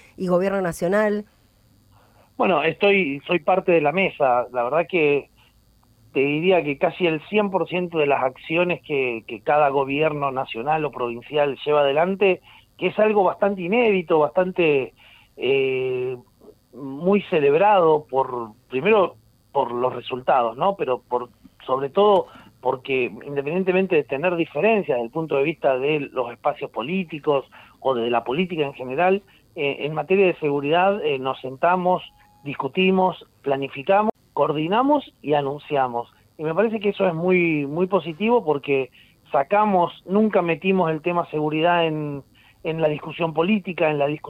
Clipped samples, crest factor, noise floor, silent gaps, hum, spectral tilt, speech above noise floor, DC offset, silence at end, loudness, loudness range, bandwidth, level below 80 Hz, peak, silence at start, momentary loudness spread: under 0.1%; 16 dB; -57 dBFS; none; none; -7 dB/octave; 36 dB; under 0.1%; 0 s; -21 LUFS; 3 LU; 12.5 kHz; -60 dBFS; -6 dBFS; 0.2 s; 8 LU